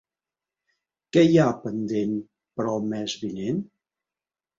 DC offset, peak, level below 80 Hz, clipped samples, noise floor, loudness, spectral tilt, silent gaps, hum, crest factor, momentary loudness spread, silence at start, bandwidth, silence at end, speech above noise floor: under 0.1%; -6 dBFS; -64 dBFS; under 0.1%; under -90 dBFS; -24 LUFS; -6.5 dB/octave; none; none; 20 dB; 13 LU; 1.15 s; 7.6 kHz; 0.95 s; over 67 dB